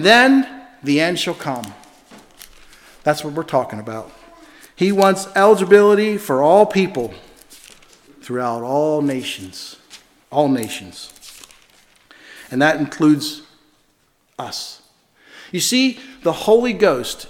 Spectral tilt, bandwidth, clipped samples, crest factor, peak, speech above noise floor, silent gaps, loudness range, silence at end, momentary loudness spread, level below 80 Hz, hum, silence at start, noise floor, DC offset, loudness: -4.5 dB/octave; 17 kHz; under 0.1%; 18 dB; 0 dBFS; 45 dB; none; 10 LU; 0.05 s; 20 LU; -56 dBFS; none; 0 s; -61 dBFS; under 0.1%; -17 LUFS